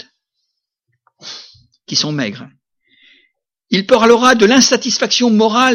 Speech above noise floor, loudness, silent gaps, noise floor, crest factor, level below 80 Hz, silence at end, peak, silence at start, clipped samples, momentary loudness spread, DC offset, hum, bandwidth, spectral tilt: 61 dB; -12 LUFS; none; -73 dBFS; 16 dB; -56 dBFS; 0 s; 0 dBFS; 1.25 s; under 0.1%; 22 LU; under 0.1%; none; 16.5 kHz; -3 dB/octave